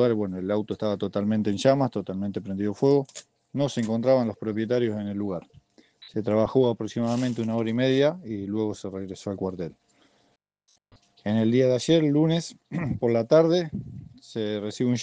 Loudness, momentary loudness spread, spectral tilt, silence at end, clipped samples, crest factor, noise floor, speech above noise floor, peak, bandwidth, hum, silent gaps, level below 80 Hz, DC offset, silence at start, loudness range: -25 LUFS; 13 LU; -7 dB/octave; 0 s; under 0.1%; 20 dB; -69 dBFS; 45 dB; -6 dBFS; 9.4 kHz; none; none; -60 dBFS; under 0.1%; 0 s; 5 LU